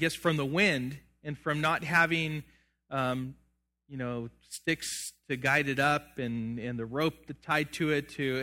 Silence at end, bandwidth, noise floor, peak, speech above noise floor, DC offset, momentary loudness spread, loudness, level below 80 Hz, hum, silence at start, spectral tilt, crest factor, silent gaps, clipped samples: 0 s; 17 kHz; -70 dBFS; -10 dBFS; 40 dB; under 0.1%; 14 LU; -30 LUFS; -62 dBFS; none; 0 s; -4.5 dB/octave; 20 dB; none; under 0.1%